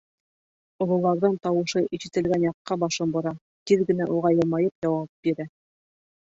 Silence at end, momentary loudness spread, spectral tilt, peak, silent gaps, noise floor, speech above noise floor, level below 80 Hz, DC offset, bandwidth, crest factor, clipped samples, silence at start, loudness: 0.85 s; 7 LU; -6.5 dB/octave; -8 dBFS; 2.54-2.65 s, 3.41-3.66 s, 4.75-4.82 s, 5.09-5.23 s; under -90 dBFS; over 66 dB; -62 dBFS; under 0.1%; 8 kHz; 18 dB; under 0.1%; 0.8 s; -25 LUFS